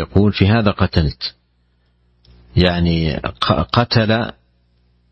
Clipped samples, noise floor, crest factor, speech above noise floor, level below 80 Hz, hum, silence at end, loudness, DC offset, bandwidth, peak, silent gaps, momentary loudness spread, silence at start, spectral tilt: under 0.1%; -60 dBFS; 18 dB; 44 dB; -32 dBFS; 60 Hz at -40 dBFS; 0.8 s; -17 LUFS; under 0.1%; 6.4 kHz; 0 dBFS; none; 8 LU; 0 s; -8 dB/octave